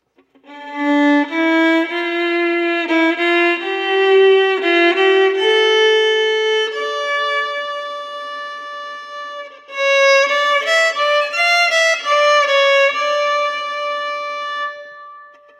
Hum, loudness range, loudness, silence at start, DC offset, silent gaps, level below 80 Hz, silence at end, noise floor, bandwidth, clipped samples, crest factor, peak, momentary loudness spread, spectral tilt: none; 5 LU; -15 LUFS; 0.5 s; under 0.1%; none; -82 dBFS; 0.3 s; -50 dBFS; 14 kHz; under 0.1%; 14 dB; -4 dBFS; 15 LU; 0 dB/octave